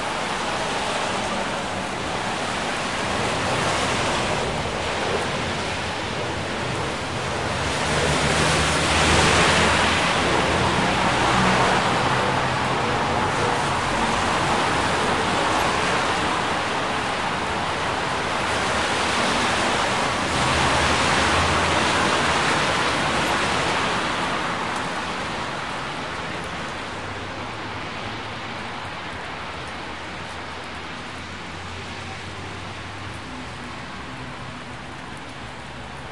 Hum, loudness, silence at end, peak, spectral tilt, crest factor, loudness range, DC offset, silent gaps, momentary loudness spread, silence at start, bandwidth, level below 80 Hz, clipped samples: none; -22 LUFS; 0 s; -4 dBFS; -3.5 dB/octave; 20 dB; 14 LU; 0.6%; none; 14 LU; 0 s; 12 kHz; -42 dBFS; under 0.1%